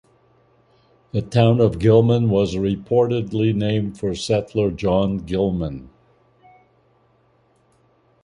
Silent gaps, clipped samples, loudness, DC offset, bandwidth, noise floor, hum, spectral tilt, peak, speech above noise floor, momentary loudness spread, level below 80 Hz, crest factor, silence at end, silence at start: none; under 0.1%; -20 LUFS; under 0.1%; 11 kHz; -60 dBFS; none; -7.5 dB/octave; -2 dBFS; 41 dB; 10 LU; -44 dBFS; 18 dB; 2.4 s; 1.15 s